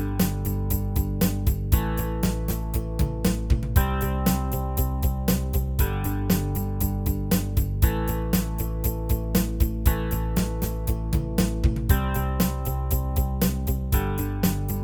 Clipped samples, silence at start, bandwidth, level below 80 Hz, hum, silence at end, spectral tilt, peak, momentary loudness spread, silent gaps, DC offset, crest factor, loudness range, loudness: under 0.1%; 0 s; 19.5 kHz; -26 dBFS; none; 0 s; -6 dB/octave; -6 dBFS; 4 LU; none; 0.1%; 18 dB; 1 LU; -25 LUFS